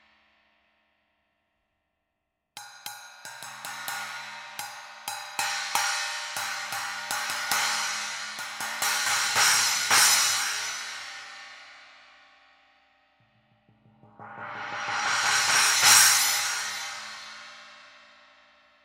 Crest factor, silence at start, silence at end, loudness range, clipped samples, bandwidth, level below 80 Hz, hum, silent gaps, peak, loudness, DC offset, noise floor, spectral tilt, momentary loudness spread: 26 dB; 2.55 s; 0.95 s; 18 LU; under 0.1%; 17 kHz; -76 dBFS; none; none; -4 dBFS; -23 LUFS; under 0.1%; -81 dBFS; 2 dB/octave; 23 LU